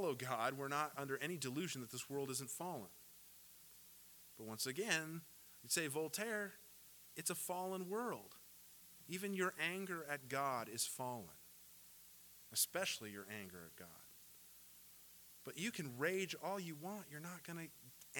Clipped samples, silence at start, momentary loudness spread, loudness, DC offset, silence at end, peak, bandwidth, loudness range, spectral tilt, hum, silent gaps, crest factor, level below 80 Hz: under 0.1%; 0 s; 19 LU; -44 LUFS; under 0.1%; 0 s; -18 dBFS; 19 kHz; 4 LU; -3 dB/octave; none; none; 28 dB; -84 dBFS